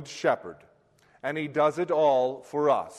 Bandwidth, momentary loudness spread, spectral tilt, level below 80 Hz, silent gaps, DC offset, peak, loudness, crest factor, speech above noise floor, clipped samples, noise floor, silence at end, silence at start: 12 kHz; 10 LU; -5.5 dB/octave; -72 dBFS; none; under 0.1%; -10 dBFS; -26 LUFS; 16 dB; 36 dB; under 0.1%; -62 dBFS; 0 s; 0 s